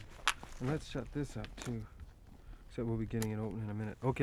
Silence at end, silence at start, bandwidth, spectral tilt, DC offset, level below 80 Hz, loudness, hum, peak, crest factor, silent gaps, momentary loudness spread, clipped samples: 0 s; 0 s; 15.5 kHz; -5.5 dB/octave; under 0.1%; -52 dBFS; -40 LUFS; none; -10 dBFS; 28 dB; none; 20 LU; under 0.1%